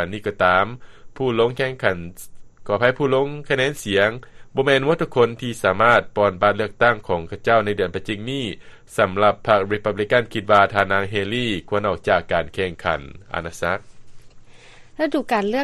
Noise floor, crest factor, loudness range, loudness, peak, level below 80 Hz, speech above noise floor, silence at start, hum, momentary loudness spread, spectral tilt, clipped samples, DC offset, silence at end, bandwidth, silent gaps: -44 dBFS; 20 dB; 5 LU; -20 LUFS; 0 dBFS; -48 dBFS; 23 dB; 0 s; none; 10 LU; -5.5 dB/octave; under 0.1%; under 0.1%; 0 s; 13 kHz; none